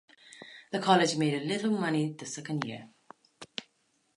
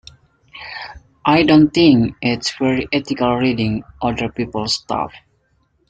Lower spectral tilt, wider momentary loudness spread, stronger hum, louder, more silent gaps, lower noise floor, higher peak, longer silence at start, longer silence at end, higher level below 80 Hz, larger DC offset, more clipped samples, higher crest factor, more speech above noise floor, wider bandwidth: about the same, -5 dB/octave vs -5.5 dB/octave; first, 23 LU vs 18 LU; neither; second, -29 LUFS vs -17 LUFS; neither; first, -73 dBFS vs -62 dBFS; second, -10 dBFS vs 0 dBFS; second, 0.3 s vs 0.55 s; second, 0.55 s vs 0.7 s; second, -78 dBFS vs -44 dBFS; neither; neither; first, 22 dB vs 16 dB; about the same, 44 dB vs 45 dB; first, 11.5 kHz vs 9.2 kHz